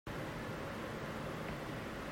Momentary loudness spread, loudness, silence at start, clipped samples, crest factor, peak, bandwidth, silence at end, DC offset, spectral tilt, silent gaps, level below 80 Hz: 1 LU; -43 LUFS; 0.05 s; under 0.1%; 14 dB; -30 dBFS; 16 kHz; 0 s; under 0.1%; -5.5 dB/octave; none; -56 dBFS